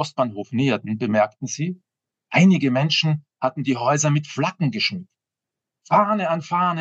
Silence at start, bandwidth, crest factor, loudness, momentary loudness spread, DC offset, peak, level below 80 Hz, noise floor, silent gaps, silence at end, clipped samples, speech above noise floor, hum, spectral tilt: 0 s; 8 kHz; 18 dB; -21 LUFS; 10 LU; under 0.1%; -4 dBFS; -78 dBFS; -87 dBFS; none; 0 s; under 0.1%; 66 dB; none; -5 dB/octave